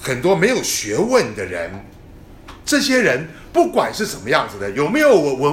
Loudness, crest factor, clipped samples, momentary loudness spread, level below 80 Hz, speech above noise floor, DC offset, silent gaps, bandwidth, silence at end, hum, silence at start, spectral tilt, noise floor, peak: -17 LUFS; 18 dB; under 0.1%; 11 LU; -46 dBFS; 23 dB; under 0.1%; none; 16.5 kHz; 0 s; none; 0 s; -4 dB/octave; -40 dBFS; 0 dBFS